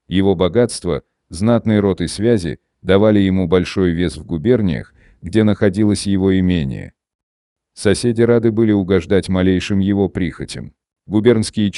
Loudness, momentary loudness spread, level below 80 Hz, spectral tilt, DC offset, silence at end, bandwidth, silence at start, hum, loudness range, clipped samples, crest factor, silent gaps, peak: -16 LUFS; 11 LU; -40 dBFS; -6.5 dB/octave; under 0.1%; 0 s; 11.5 kHz; 0.1 s; none; 1 LU; under 0.1%; 16 dB; 7.15-7.56 s; 0 dBFS